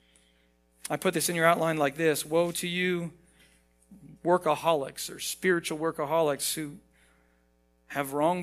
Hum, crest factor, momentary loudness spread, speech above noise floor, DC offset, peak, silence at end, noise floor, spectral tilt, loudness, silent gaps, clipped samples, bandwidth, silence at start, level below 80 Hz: none; 24 dB; 11 LU; 40 dB; under 0.1%; -6 dBFS; 0 s; -67 dBFS; -4 dB/octave; -28 LUFS; none; under 0.1%; 16 kHz; 0.85 s; -66 dBFS